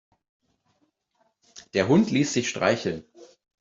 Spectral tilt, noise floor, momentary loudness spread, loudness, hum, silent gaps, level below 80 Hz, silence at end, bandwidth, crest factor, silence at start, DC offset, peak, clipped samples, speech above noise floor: -5 dB/octave; -71 dBFS; 10 LU; -24 LUFS; none; none; -64 dBFS; 0.35 s; 8 kHz; 20 dB; 1.55 s; under 0.1%; -6 dBFS; under 0.1%; 48 dB